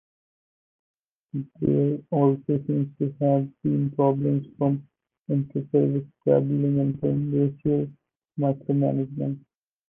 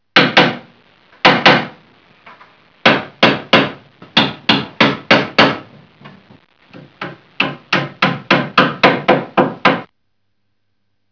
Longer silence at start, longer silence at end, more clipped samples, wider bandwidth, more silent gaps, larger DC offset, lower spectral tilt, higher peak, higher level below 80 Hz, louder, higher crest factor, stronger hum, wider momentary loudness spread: first, 1.35 s vs 0.15 s; second, 0.5 s vs 1.25 s; second, under 0.1% vs 0.4%; second, 3.4 kHz vs 5.4 kHz; first, 5.19-5.23 s vs none; neither; first, -13.5 dB/octave vs -5 dB/octave; second, -8 dBFS vs 0 dBFS; second, -60 dBFS vs -54 dBFS; second, -25 LUFS vs -13 LUFS; about the same, 18 dB vs 16 dB; neither; second, 9 LU vs 12 LU